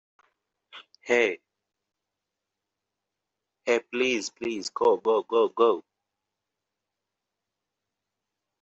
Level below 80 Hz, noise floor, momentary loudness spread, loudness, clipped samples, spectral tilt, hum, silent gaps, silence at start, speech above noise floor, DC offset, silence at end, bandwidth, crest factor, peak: -76 dBFS; -86 dBFS; 10 LU; -26 LUFS; under 0.1%; -3 dB/octave; 50 Hz at -80 dBFS; none; 0.75 s; 61 dB; under 0.1%; 2.8 s; 8.2 kHz; 22 dB; -8 dBFS